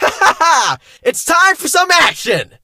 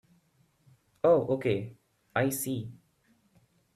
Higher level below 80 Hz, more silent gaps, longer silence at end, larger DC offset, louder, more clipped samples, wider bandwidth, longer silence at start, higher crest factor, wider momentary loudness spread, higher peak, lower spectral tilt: first, -50 dBFS vs -68 dBFS; neither; second, 0.2 s vs 1 s; neither; first, -12 LUFS vs -29 LUFS; neither; first, 17 kHz vs 14 kHz; second, 0 s vs 1.05 s; second, 12 dB vs 20 dB; second, 8 LU vs 14 LU; first, 0 dBFS vs -12 dBFS; second, -1 dB/octave vs -5.5 dB/octave